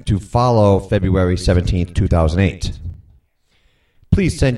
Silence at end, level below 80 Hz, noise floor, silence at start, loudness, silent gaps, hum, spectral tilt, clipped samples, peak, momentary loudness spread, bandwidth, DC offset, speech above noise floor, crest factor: 0 s; -26 dBFS; -59 dBFS; 0.05 s; -16 LUFS; none; none; -7 dB/octave; under 0.1%; 0 dBFS; 12 LU; 11.5 kHz; under 0.1%; 44 dB; 16 dB